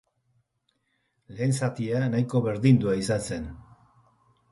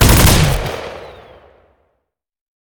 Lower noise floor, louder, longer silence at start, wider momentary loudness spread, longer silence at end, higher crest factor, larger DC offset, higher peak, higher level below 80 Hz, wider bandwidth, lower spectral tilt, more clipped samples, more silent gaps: about the same, -75 dBFS vs -76 dBFS; second, -26 LUFS vs -12 LUFS; first, 1.3 s vs 0 s; second, 13 LU vs 22 LU; second, 0.9 s vs 1.55 s; about the same, 20 dB vs 16 dB; neither; second, -8 dBFS vs 0 dBFS; second, -54 dBFS vs -22 dBFS; second, 11.5 kHz vs over 20 kHz; first, -7 dB/octave vs -4 dB/octave; neither; neither